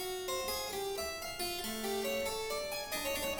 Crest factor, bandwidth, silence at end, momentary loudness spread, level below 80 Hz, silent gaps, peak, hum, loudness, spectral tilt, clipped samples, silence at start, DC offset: 14 dB; over 20 kHz; 0 s; 3 LU; -56 dBFS; none; -24 dBFS; none; -37 LUFS; -2 dB/octave; under 0.1%; 0 s; under 0.1%